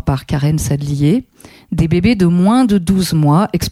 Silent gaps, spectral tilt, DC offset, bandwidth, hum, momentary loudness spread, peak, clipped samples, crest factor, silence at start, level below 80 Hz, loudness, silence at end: none; -6.5 dB/octave; under 0.1%; 15.5 kHz; none; 6 LU; -2 dBFS; under 0.1%; 12 dB; 0.05 s; -32 dBFS; -14 LUFS; 0 s